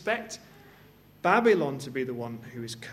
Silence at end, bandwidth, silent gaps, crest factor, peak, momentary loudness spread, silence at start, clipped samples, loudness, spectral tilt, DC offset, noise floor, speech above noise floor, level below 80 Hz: 0 s; 14 kHz; none; 22 dB; -8 dBFS; 17 LU; 0 s; under 0.1%; -28 LUFS; -5 dB/octave; under 0.1%; -55 dBFS; 27 dB; -68 dBFS